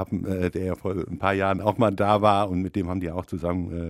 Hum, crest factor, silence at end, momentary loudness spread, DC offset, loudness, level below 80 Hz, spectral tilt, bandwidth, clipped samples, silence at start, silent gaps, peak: none; 20 dB; 0 s; 9 LU; under 0.1%; -25 LUFS; -48 dBFS; -7.5 dB/octave; 15 kHz; under 0.1%; 0 s; none; -4 dBFS